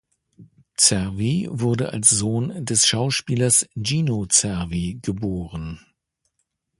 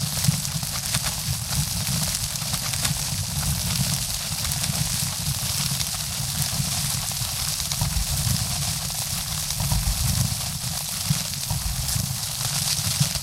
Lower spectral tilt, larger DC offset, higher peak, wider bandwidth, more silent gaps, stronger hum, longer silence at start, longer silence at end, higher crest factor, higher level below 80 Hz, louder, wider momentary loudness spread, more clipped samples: about the same, -3.5 dB/octave vs -2.5 dB/octave; neither; about the same, 0 dBFS vs -2 dBFS; second, 12 kHz vs 17 kHz; neither; neither; first, 0.4 s vs 0 s; first, 1.05 s vs 0 s; about the same, 22 dB vs 22 dB; second, -46 dBFS vs -36 dBFS; first, -20 LUFS vs -24 LUFS; first, 11 LU vs 3 LU; neither